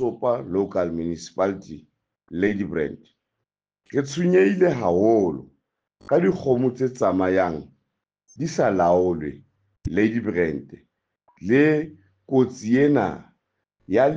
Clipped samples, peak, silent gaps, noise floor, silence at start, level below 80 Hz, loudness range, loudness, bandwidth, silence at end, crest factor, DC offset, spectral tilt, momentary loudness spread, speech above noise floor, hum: under 0.1%; -6 dBFS; none; -83 dBFS; 0 s; -54 dBFS; 5 LU; -22 LUFS; 7.8 kHz; 0 s; 16 dB; under 0.1%; -7 dB/octave; 16 LU; 62 dB; none